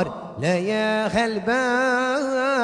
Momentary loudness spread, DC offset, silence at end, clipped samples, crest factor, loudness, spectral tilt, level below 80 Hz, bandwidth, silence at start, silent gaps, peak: 4 LU; under 0.1%; 0 s; under 0.1%; 14 dB; -22 LUFS; -5 dB/octave; -54 dBFS; 10.5 kHz; 0 s; none; -8 dBFS